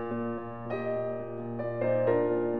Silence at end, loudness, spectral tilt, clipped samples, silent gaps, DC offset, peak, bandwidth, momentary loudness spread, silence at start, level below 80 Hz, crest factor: 0 s; -31 LUFS; -11 dB/octave; under 0.1%; none; 0.4%; -14 dBFS; 4.8 kHz; 10 LU; 0 s; -64 dBFS; 16 dB